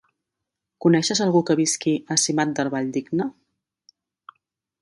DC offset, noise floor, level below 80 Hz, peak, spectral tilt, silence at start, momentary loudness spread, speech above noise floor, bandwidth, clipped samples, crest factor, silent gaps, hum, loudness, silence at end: under 0.1%; -84 dBFS; -68 dBFS; -4 dBFS; -4 dB/octave; 0.8 s; 7 LU; 62 dB; 11.5 kHz; under 0.1%; 20 dB; none; none; -21 LUFS; 1.5 s